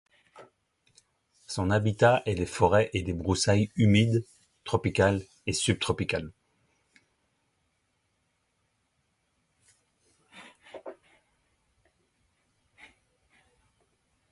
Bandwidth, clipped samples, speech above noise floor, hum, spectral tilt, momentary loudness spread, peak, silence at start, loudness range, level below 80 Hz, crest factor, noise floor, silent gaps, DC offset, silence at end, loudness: 11.5 kHz; under 0.1%; 50 dB; none; -5.5 dB/octave; 22 LU; -8 dBFS; 0.35 s; 9 LU; -50 dBFS; 22 dB; -75 dBFS; none; under 0.1%; 3.4 s; -26 LUFS